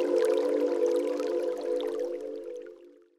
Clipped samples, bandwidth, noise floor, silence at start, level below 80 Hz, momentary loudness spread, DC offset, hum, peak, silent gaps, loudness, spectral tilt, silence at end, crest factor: under 0.1%; 13 kHz; -52 dBFS; 0 s; -80 dBFS; 15 LU; under 0.1%; none; -14 dBFS; none; -29 LUFS; -3.5 dB/octave; 0.3 s; 14 dB